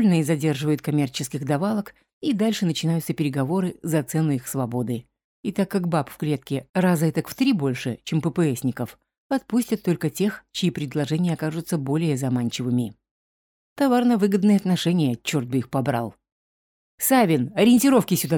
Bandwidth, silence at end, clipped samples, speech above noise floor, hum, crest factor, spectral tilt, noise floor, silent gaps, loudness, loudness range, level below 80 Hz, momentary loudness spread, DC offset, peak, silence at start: 19.5 kHz; 0 s; under 0.1%; over 68 dB; none; 16 dB; -6 dB/octave; under -90 dBFS; 2.13-2.21 s, 5.24-5.43 s, 6.69-6.74 s, 9.18-9.30 s, 13.11-13.76 s, 16.32-16.98 s; -23 LUFS; 3 LU; -62 dBFS; 9 LU; under 0.1%; -8 dBFS; 0 s